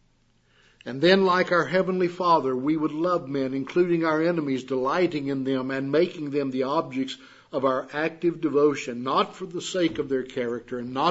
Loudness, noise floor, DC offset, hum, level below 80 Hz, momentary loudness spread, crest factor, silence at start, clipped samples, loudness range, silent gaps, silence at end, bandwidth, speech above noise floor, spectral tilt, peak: -25 LUFS; -64 dBFS; under 0.1%; none; -64 dBFS; 9 LU; 20 dB; 0.85 s; under 0.1%; 3 LU; none; 0 s; 8 kHz; 39 dB; -6 dB/octave; -4 dBFS